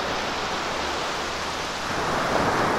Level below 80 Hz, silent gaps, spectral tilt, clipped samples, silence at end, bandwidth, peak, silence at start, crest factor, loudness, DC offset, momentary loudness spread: -46 dBFS; none; -3.5 dB/octave; under 0.1%; 0 s; 16 kHz; -10 dBFS; 0 s; 16 dB; -26 LUFS; under 0.1%; 5 LU